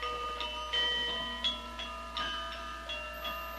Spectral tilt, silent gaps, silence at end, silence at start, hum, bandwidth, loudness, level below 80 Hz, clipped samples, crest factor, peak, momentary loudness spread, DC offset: -2 dB/octave; none; 0 s; 0 s; none; 16 kHz; -34 LUFS; -50 dBFS; under 0.1%; 16 dB; -20 dBFS; 10 LU; under 0.1%